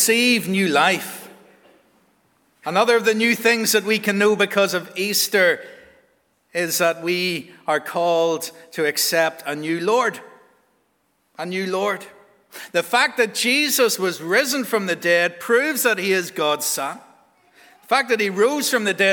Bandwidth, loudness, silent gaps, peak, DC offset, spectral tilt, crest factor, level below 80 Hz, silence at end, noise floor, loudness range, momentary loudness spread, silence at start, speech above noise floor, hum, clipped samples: over 20 kHz; -19 LUFS; none; -2 dBFS; under 0.1%; -2.5 dB/octave; 20 dB; -76 dBFS; 0 s; -66 dBFS; 5 LU; 10 LU; 0 s; 47 dB; none; under 0.1%